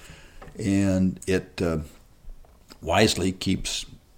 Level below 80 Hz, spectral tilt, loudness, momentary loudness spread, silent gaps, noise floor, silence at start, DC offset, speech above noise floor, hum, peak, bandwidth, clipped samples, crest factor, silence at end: -46 dBFS; -5 dB/octave; -25 LUFS; 12 LU; none; -47 dBFS; 0 s; under 0.1%; 22 dB; none; -6 dBFS; 16.5 kHz; under 0.1%; 20 dB; 0.2 s